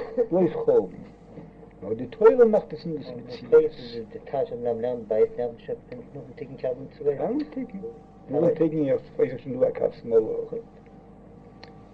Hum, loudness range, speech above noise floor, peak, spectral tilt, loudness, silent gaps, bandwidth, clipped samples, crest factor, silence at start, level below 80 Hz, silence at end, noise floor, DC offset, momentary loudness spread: none; 6 LU; 23 dB; -4 dBFS; -9 dB/octave; -25 LUFS; none; 5.2 kHz; under 0.1%; 20 dB; 0 s; -56 dBFS; 0.1 s; -48 dBFS; under 0.1%; 20 LU